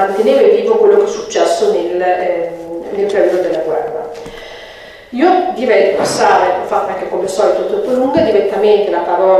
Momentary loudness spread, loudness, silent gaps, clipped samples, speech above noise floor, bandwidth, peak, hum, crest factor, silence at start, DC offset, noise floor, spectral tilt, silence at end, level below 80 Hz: 14 LU; -13 LUFS; none; under 0.1%; 22 dB; 13 kHz; 0 dBFS; none; 12 dB; 0 s; under 0.1%; -34 dBFS; -4.5 dB/octave; 0 s; -50 dBFS